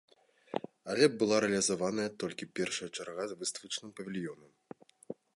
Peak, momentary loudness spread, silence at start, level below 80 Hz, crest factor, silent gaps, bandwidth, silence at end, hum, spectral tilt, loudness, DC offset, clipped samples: -12 dBFS; 21 LU; 0.55 s; -74 dBFS; 22 dB; none; 11.5 kHz; 0.25 s; none; -3.5 dB/octave; -34 LUFS; under 0.1%; under 0.1%